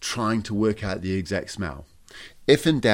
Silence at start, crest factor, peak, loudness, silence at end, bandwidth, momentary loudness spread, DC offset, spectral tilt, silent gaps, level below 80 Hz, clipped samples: 0 s; 20 dB; -4 dBFS; -24 LUFS; 0 s; 16 kHz; 20 LU; under 0.1%; -5 dB/octave; none; -48 dBFS; under 0.1%